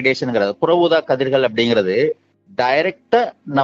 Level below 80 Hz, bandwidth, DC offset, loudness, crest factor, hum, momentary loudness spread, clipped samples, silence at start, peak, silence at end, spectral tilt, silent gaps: -62 dBFS; 7.6 kHz; under 0.1%; -17 LUFS; 14 dB; none; 5 LU; under 0.1%; 0 s; -2 dBFS; 0 s; -6 dB/octave; none